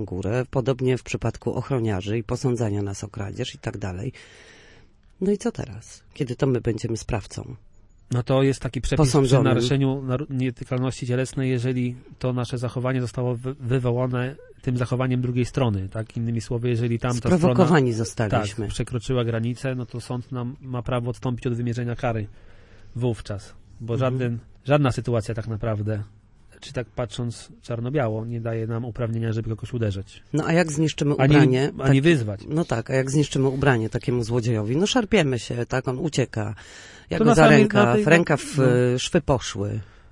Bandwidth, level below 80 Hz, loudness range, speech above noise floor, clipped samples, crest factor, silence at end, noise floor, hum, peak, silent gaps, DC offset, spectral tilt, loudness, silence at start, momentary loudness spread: 11.5 kHz; -44 dBFS; 9 LU; 29 dB; under 0.1%; 20 dB; 0.25 s; -52 dBFS; none; -2 dBFS; none; under 0.1%; -6.5 dB/octave; -23 LUFS; 0 s; 14 LU